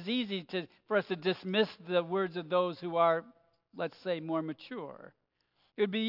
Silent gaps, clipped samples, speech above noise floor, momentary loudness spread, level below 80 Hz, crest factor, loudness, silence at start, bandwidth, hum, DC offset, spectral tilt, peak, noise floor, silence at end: none; under 0.1%; 42 dB; 14 LU; -86 dBFS; 20 dB; -33 LUFS; 0 s; 5.8 kHz; none; under 0.1%; -7.5 dB/octave; -14 dBFS; -75 dBFS; 0 s